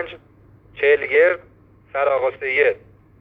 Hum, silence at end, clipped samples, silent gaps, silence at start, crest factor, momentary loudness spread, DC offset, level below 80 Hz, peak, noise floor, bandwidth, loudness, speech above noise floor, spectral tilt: none; 0.45 s; under 0.1%; none; 0 s; 16 dB; 14 LU; under 0.1%; -58 dBFS; -4 dBFS; -50 dBFS; 4.7 kHz; -19 LUFS; 32 dB; -6.5 dB/octave